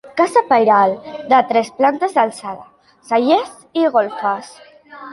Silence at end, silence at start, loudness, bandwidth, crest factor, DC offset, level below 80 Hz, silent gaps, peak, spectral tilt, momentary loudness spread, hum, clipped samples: 0 s; 0.05 s; -16 LUFS; 11.5 kHz; 16 dB; under 0.1%; -66 dBFS; none; -2 dBFS; -4.5 dB/octave; 14 LU; none; under 0.1%